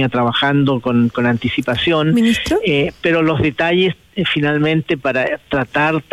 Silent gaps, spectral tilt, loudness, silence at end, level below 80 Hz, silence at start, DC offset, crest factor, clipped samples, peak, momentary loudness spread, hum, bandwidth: none; -6.5 dB/octave; -16 LUFS; 0.1 s; -44 dBFS; 0 s; under 0.1%; 10 dB; under 0.1%; -4 dBFS; 4 LU; none; 14 kHz